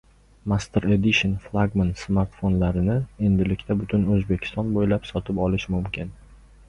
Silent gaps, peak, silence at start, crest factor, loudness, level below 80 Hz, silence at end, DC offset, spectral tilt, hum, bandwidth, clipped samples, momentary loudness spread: none; -6 dBFS; 0.45 s; 16 dB; -23 LUFS; -38 dBFS; 0.35 s; under 0.1%; -7 dB/octave; none; 10 kHz; under 0.1%; 7 LU